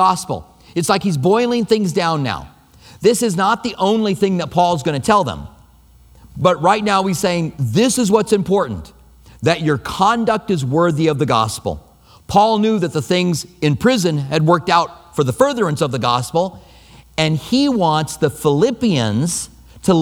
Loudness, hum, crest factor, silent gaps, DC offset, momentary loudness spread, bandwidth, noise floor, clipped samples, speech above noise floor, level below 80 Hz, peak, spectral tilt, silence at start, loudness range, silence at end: -17 LUFS; none; 16 dB; none; under 0.1%; 8 LU; 18 kHz; -47 dBFS; under 0.1%; 31 dB; -46 dBFS; 0 dBFS; -5.5 dB/octave; 0 s; 1 LU; 0 s